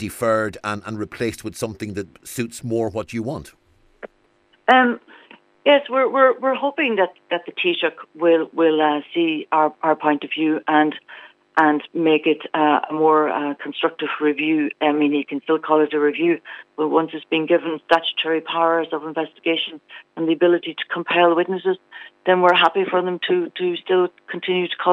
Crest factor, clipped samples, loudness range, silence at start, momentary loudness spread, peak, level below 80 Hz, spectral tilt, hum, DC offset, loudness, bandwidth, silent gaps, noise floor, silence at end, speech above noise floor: 18 dB; under 0.1%; 4 LU; 0 s; 11 LU; -2 dBFS; -62 dBFS; -5 dB/octave; none; under 0.1%; -20 LUFS; 15 kHz; none; -60 dBFS; 0 s; 40 dB